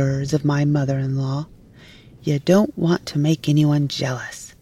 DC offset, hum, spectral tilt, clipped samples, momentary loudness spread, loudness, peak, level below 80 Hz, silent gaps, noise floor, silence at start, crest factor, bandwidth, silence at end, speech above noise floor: under 0.1%; none; -6.5 dB/octave; under 0.1%; 12 LU; -20 LUFS; -4 dBFS; -50 dBFS; none; -46 dBFS; 0 s; 16 dB; 13.5 kHz; 0.15 s; 26 dB